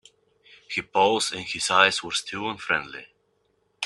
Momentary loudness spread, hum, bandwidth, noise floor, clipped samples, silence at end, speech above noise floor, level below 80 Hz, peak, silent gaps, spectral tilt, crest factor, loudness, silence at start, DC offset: 12 LU; 50 Hz at -60 dBFS; 12.5 kHz; -69 dBFS; under 0.1%; 0 s; 45 dB; -66 dBFS; -2 dBFS; none; -1.5 dB/octave; 24 dB; -23 LUFS; 0.7 s; under 0.1%